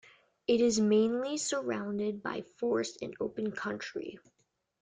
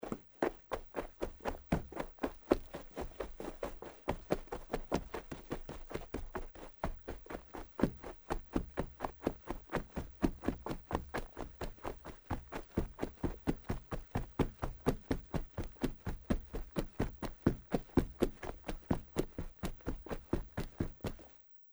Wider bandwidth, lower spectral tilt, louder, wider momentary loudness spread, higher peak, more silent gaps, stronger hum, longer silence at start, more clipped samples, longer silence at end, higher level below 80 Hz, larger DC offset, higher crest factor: second, 9.6 kHz vs over 20 kHz; second, -4.5 dB/octave vs -7 dB/octave; first, -32 LUFS vs -41 LUFS; first, 13 LU vs 10 LU; second, -16 dBFS vs -12 dBFS; neither; neither; first, 0.5 s vs 0 s; neither; first, 0.65 s vs 0 s; second, -72 dBFS vs -46 dBFS; neither; second, 16 dB vs 28 dB